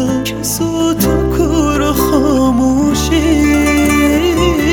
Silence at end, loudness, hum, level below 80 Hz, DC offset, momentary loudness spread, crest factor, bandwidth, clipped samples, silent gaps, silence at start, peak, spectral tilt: 0 s; -12 LUFS; none; -24 dBFS; under 0.1%; 4 LU; 12 dB; over 20 kHz; under 0.1%; none; 0 s; 0 dBFS; -5 dB/octave